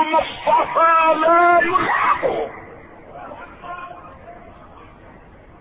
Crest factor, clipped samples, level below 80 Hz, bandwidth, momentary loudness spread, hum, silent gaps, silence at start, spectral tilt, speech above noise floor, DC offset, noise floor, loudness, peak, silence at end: 14 dB; under 0.1%; -50 dBFS; 5 kHz; 23 LU; none; none; 0 s; -9 dB/octave; 28 dB; under 0.1%; -44 dBFS; -16 LUFS; -6 dBFS; 1.1 s